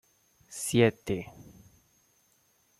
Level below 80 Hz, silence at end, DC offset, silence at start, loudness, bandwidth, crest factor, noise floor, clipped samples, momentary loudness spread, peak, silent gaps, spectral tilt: -62 dBFS; 1.4 s; under 0.1%; 0.5 s; -28 LUFS; 14.5 kHz; 22 dB; -69 dBFS; under 0.1%; 20 LU; -10 dBFS; none; -5 dB/octave